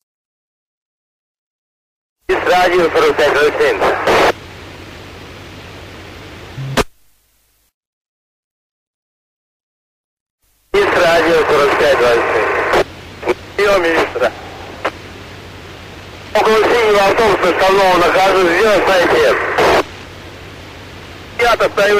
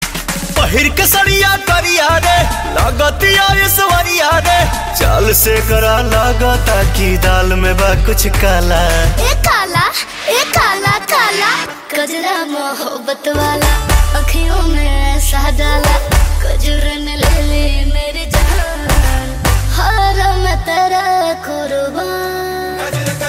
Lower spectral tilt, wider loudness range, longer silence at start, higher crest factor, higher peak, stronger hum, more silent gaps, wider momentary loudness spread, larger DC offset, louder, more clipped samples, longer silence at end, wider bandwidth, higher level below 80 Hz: about the same, -4 dB/octave vs -3.5 dB/octave; first, 15 LU vs 4 LU; first, 2.3 s vs 0 s; about the same, 12 dB vs 12 dB; about the same, -2 dBFS vs 0 dBFS; neither; first, 7.74-10.38 s vs none; first, 22 LU vs 8 LU; neither; about the same, -12 LUFS vs -13 LUFS; neither; about the same, 0 s vs 0 s; about the same, 16 kHz vs 16.5 kHz; second, -40 dBFS vs -16 dBFS